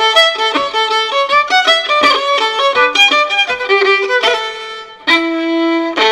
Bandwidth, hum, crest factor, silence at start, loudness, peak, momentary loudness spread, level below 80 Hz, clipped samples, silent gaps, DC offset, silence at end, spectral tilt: 15.5 kHz; none; 12 dB; 0 s; -11 LUFS; 0 dBFS; 7 LU; -56 dBFS; under 0.1%; none; under 0.1%; 0 s; -0.5 dB/octave